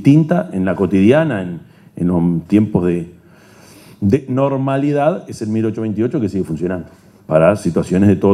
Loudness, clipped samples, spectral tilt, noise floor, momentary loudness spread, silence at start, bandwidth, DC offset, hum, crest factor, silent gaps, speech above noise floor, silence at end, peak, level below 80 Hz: -16 LUFS; under 0.1%; -8.5 dB/octave; -44 dBFS; 10 LU; 0 s; 12.5 kHz; under 0.1%; none; 16 dB; none; 30 dB; 0 s; 0 dBFS; -52 dBFS